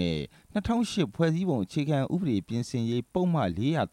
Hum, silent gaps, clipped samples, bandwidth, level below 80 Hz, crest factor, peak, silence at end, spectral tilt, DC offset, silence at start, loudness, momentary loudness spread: none; none; under 0.1%; 12 kHz; -52 dBFS; 16 dB; -12 dBFS; 0.05 s; -7 dB/octave; under 0.1%; 0 s; -29 LUFS; 5 LU